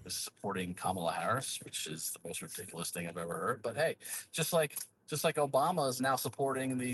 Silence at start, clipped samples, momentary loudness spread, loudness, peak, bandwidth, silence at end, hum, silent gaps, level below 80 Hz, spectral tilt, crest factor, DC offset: 0 s; under 0.1%; 9 LU; -35 LUFS; -18 dBFS; 15.5 kHz; 0 s; none; none; -74 dBFS; -3.5 dB/octave; 18 dB; under 0.1%